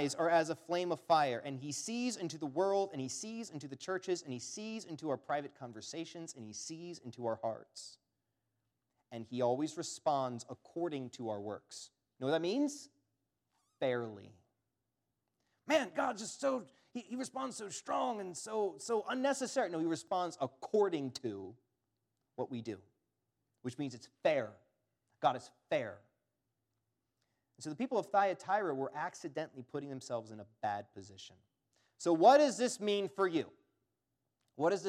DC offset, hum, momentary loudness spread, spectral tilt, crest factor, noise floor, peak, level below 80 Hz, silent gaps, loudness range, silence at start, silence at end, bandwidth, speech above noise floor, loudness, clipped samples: under 0.1%; none; 15 LU; -4.5 dB/octave; 24 dB; -87 dBFS; -14 dBFS; -90 dBFS; none; 9 LU; 0 s; 0 s; 14 kHz; 51 dB; -37 LUFS; under 0.1%